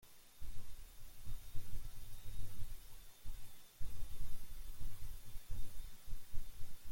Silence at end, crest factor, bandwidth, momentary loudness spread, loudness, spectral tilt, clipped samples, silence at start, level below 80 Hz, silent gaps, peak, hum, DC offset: 0 s; 12 dB; 16.5 kHz; 5 LU; -55 LUFS; -4 dB/octave; under 0.1%; 0.05 s; -48 dBFS; none; -24 dBFS; none; under 0.1%